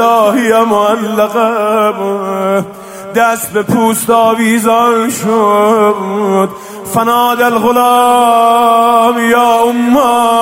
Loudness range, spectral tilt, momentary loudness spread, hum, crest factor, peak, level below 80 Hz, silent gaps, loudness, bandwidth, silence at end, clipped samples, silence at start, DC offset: 4 LU; -4.5 dB/octave; 7 LU; none; 10 dB; 0 dBFS; -52 dBFS; none; -10 LUFS; 16.5 kHz; 0 s; under 0.1%; 0 s; under 0.1%